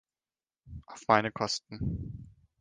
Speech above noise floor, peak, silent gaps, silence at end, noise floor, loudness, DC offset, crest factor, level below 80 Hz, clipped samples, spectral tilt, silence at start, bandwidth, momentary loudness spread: over 59 dB; -6 dBFS; none; 0.3 s; under -90 dBFS; -31 LUFS; under 0.1%; 26 dB; -52 dBFS; under 0.1%; -4.5 dB/octave; 0.65 s; 10 kHz; 22 LU